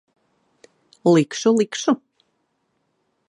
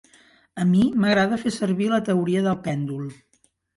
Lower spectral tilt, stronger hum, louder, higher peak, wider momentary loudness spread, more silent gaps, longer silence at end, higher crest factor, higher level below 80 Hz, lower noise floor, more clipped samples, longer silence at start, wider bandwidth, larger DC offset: about the same, -5.5 dB/octave vs -6.5 dB/octave; neither; about the same, -20 LUFS vs -22 LUFS; first, -4 dBFS vs -8 dBFS; second, 6 LU vs 12 LU; neither; first, 1.35 s vs 0.65 s; about the same, 18 dB vs 14 dB; second, -74 dBFS vs -58 dBFS; first, -71 dBFS vs -56 dBFS; neither; first, 1.05 s vs 0.55 s; about the same, 11 kHz vs 11.5 kHz; neither